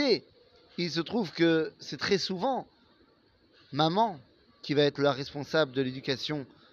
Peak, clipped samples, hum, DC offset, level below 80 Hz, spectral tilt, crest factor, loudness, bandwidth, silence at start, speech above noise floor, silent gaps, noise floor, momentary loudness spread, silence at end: -10 dBFS; under 0.1%; none; under 0.1%; -70 dBFS; -5.5 dB/octave; 20 dB; -29 LUFS; 7.6 kHz; 0 s; 36 dB; none; -65 dBFS; 10 LU; 0.3 s